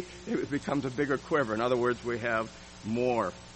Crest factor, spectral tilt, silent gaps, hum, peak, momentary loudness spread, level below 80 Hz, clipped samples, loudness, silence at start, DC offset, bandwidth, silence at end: 16 dB; -6 dB/octave; none; none; -14 dBFS; 7 LU; -58 dBFS; under 0.1%; -31 LUFS; 0 s; under 0.1%; 8.4 kHz; 0 s